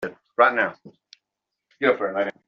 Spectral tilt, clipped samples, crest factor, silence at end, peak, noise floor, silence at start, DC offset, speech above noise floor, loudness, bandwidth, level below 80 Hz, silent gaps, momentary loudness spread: -2 dB/octave; under 0.1%; 22 dB; 0.15 s; -4 dBFS; -84 dBFS; 0 s; under 0.1%; 62 dB; -22 LUFS; 6.6 kHz; -70 dBFS; none; 8 LU